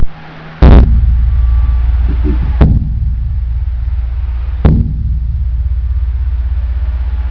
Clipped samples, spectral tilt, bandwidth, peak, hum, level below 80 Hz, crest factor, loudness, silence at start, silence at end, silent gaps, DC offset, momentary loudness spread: 1%; -10.5 dB/octave; 4.9 kHz; 0 dBFS; none; -12 dBFS; 10 dB; -13 LUFS; 0 s; 0 s; none; under 0.1%; 9 LU